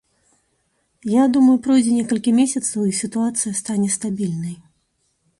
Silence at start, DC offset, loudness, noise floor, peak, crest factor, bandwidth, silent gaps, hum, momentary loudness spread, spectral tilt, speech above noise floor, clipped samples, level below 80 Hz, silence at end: 1.05 s; under 0.1%; -19 LUFS; -68 dBFS; -6 dBFS; 14 dB; 11.5 kHz; none; none; 11 LU; -5 dB/octave; 50 dB; under 0.1%; -62 dBFS; 0.85 s